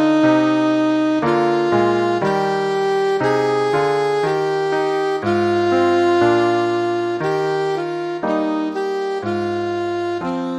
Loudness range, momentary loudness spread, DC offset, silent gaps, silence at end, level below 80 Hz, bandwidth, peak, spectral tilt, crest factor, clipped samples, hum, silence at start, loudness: 4 LU; 7 LU; under 0.1%; none; 0 s; -58 dBFS; 10.5 kHz; -4 dBFS; -6.5 dB/octave; 14 dB; under 0.1%; none; 0 s; -18 LUFS